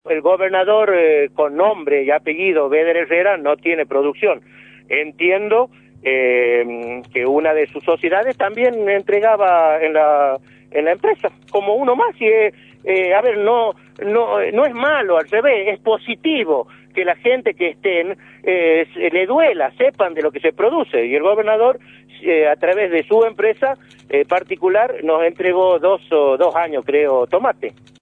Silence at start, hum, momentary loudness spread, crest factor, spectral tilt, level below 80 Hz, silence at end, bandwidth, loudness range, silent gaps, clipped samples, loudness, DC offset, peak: 0.05 s; 50 Hz at -55 dBFS; 6 LU; 14 dB; -6.5 dB/octave; -66 dBFS; 0.3 s; 4.1 kHz; 2 LU; none; under 0.1%; -16 LUFS; under 0.1%; -2 dBFS